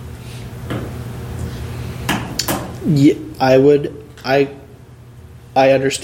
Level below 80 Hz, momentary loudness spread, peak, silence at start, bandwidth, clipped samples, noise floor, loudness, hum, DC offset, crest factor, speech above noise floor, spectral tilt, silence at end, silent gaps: -40 dBFS; 16 LU; 0 dBFS; 0 s; 17 kHz; under 0.1%; -39 dBFS; -17 LUFS; none; under 0.1%; 16 dB; 26 dB; -5.5 dB/octave; 0 s; none